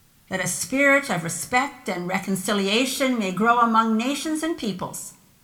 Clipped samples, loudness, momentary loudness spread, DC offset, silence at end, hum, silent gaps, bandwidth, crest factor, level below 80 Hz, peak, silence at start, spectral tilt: under 0.1%; -22 LUFS; 12 LU; under 0.1%; 0.3 s; none; none; 18 kHz; 16 dB; -60 dBFS; -6 dBFS; 0.3 s; -3.5 dB/octave